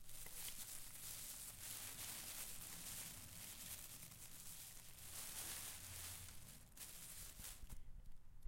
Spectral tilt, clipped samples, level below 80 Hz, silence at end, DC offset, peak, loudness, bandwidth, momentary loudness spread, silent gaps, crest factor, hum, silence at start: -1 dB/octave; under 0.1%; -64 dBFS; 0 s; under 0.1%; -32 dBFS; -52 LUFS; 16.5 kHz; 8 LU; none; 20 dB; none; 0 s